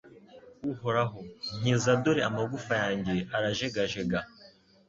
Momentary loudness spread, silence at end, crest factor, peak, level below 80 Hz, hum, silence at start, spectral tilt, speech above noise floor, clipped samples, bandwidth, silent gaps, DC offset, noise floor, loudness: 12 LU; 0.4 s; 18 dB; -12 dBFS; -58 dBFS; none; 0.05 s; -5 dB/octave; 28 dB; under 0.1%; 7.8 kHz; none; under 0.1%; -57 dBFS; -30 LUFS